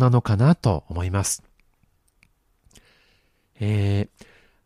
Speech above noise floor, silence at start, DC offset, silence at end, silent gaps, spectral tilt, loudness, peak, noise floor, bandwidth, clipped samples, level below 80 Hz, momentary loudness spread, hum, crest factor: 44 dB; 0 s; under 0.1%; 0.6 s; none; -6 dB/octave; -23 LUFS; -4 dBFS; -64 dBFS; 14.5 kHz; under 0.1%; -46 dBFS; 11 LU; none; 18 dB